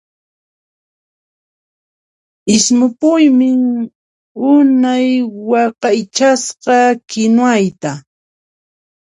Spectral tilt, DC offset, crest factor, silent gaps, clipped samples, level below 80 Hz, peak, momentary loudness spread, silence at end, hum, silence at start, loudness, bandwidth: -4 dB/octave; under 0.1%; 14 dB; 3.95-4.35 s; under 0.1%; -60 dBFS; 0 dBFS; 10 LU; 1.2 s; none; 2.45 s; -12 LUFS; 11 kHz